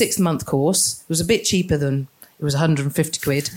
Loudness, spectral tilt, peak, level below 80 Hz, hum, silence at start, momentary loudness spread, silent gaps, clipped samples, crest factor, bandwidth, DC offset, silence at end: -20 LUFS; -4.5 dB/octave; -4 dBFS; -46 dBFS; none; 0 s; 6 LU; none; under 0.1%; 16 dB; 17 kHz; under 0.1%; 0 s